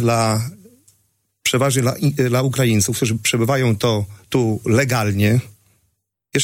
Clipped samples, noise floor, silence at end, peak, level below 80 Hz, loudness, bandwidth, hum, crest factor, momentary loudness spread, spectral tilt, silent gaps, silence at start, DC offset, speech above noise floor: under 0.1%; -69 dBFS; 0 s; -4 dBFS; -52 dBFS; -18 LUFS; 17 kHz; none; 16 dB; 6 LU; -5 dB/octave; none; 0 s; under 0.1%; 51 dB